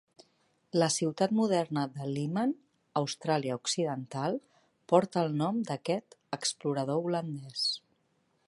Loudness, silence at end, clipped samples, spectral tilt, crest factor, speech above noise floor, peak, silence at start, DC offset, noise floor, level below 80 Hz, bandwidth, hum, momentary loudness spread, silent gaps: -31 LUFS; 0.7 s; under 0.1%; -5 dB/octave; 22 dB; 43 dB; -8 dBFS; 0.75 s; under 0.1%; -73 dBFS; -78 dBFS; 11.5 kHz; none; 7 LU; none